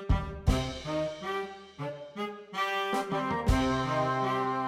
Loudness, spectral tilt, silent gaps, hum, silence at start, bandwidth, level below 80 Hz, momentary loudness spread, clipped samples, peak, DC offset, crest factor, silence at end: -31 LUFS; -6 dB/octave; none; none; 0 s; 16 kHz; -38 dBFS; 11 LU; under 0.1%; -12 dBFS; under 0.1%; 18 dB; 0 s